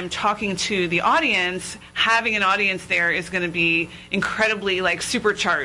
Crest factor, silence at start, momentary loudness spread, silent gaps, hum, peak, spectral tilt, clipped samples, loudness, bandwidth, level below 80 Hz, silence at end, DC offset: 14 dB; 0 s; 6 LU; none; none; -6 dBFS; -3 dB/octave; under 0.1%; -20 LUFS; 12 kHz; -52 dBFS; 0 s; under 0.1%